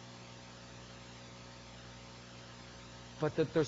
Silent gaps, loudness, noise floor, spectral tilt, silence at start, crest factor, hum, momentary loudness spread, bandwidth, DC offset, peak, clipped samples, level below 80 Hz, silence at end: none; -44 LUFS; -52 dBFS; -5.5 dB/octave; 0 s; 22 dB; 60 Hz at -55 dBFS; 15 LU; 7.6 kHz; under 0.1%; -20 dBFS; under 0.1%; -64 dBFS; 0 s